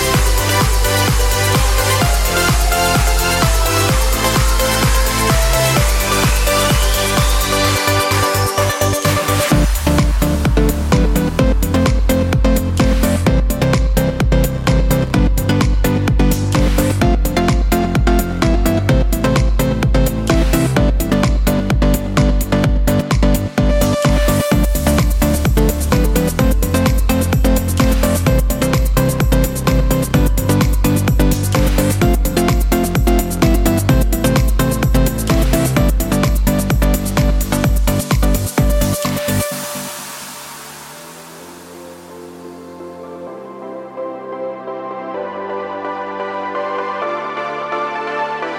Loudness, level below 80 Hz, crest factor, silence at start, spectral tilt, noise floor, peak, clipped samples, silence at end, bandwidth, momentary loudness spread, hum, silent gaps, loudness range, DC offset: -15 LUFS; -18 dBFS; 14 dB; 0 s; -5 dB/octave; -35 dBFS; 0 dBFS; under 0.1%; 0 s; 17 kHz; 12 LU; none; none; 10 LU; under 0.1%